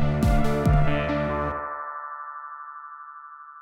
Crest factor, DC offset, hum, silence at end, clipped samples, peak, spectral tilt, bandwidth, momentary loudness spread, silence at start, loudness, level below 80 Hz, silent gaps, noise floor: 16 dB; under 0.1%; none; 0 s; under 0.1%; -10 dBFS; -7.5 dB/octave; 15.5 kHz; 19 LU; 0 s; -26 LUFS; -30 dBFS; none; -43 dBFS